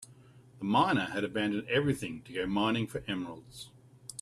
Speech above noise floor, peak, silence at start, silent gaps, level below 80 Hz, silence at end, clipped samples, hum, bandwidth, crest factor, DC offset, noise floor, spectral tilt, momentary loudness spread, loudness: 25 dB; -14 dBFS; 0 s; none; -62 dBFS; 0 s; under 0.1%; none; 14 kHz; 18 dB; under 0.1%; -57 dBFS; -5.5 dB/octave; 19 LU; -31 LUFS